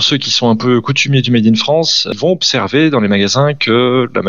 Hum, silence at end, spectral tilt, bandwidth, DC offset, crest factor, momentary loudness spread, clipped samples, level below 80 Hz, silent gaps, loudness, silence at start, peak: none; 0 s; -4.5 dB/octave; 7.6 kHz; 0.8%; 10 dB; 2 LU; under 0.1%; -58 dBFS; none; -11 LUFS; 0 s; 0 dBFS